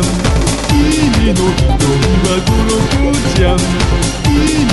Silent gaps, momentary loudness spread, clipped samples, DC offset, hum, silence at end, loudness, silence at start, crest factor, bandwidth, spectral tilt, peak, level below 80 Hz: none; 2 LU; under 0.1%; under 0.1%; none; 0 s; -12 LUFS; 0 s; 12 dB; 12 kHz; -5 dB/octave; 0 dBFS; -18 dBFS